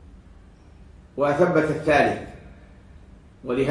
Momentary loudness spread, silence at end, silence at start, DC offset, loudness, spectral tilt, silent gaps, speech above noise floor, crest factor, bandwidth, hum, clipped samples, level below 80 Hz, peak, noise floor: 20 LU; 0 s; 0.15 s; under 0.1%; -22 LUFS; -6.5 dB/octave; none; 28 dB; 20 dB; 10.5 kHz; none; under 0.1%; -48 dBFS; -6 dBFS; -48 dBFS